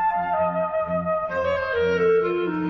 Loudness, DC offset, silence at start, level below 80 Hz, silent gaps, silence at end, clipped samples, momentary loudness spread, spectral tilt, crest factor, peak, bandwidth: -23 LUFS; under 0.1%; 0 s; -48 dBFS; none; 0 s; under 0.1%; 5 LU; -7.5 dB/octave; 12 dB; -12 dBFS; 6.2 kHz